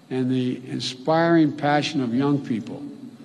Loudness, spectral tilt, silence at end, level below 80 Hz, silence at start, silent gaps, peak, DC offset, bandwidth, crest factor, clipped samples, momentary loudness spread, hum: -22 LUFS; -6 dB/octave; 0 s; -70 dBFS; 0.1 s; none; -6 dBFS; under 0.1%; 10.5 kHz; 16 dB; under 0.1%; 12 LU; none